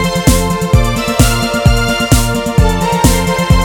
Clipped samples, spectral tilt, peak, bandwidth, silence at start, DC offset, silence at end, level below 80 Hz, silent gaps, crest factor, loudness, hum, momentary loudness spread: 0.5%; -5 dB/octave; 0 dBFS; 19.5 kHz; 0 s; under 0.1%; 0 s; -16 dBFS; none; 10 dB; -12 LUFS; none; 2 LU